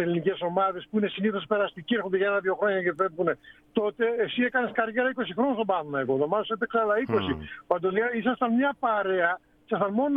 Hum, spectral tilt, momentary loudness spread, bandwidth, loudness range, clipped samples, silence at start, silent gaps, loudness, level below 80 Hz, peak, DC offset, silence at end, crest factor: none; -8.5 dB/octave; 4 LU; 5 kHz; 1 LU; under 0.1%; 0 s; none; -27 LUFS; -60 dBFS; -8 dBFS; under 0.1%; 0 s; 18 dB